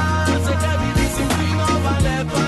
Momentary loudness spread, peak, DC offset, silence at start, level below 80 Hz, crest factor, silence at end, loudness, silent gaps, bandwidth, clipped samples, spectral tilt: 1 LU; -6 dBFS; under 0.1%; 0 s; -28 dBFS; 12 dB; 0 s; -19 LUFS; none; 12.5 kHz; under 0.1%; -5.5 dB/octave